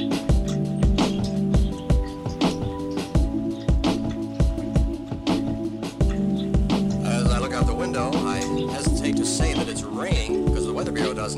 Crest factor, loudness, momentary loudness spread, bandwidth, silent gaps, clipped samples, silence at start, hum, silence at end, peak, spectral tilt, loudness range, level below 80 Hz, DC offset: 12 dB; -24 LUFS; 6 LU; 13 kHz; none; under 0.1%; 0 s; none; 0 s; -10 dBFS; -6 dB/octave; 2 LU; -28 dBFS; under 0.1%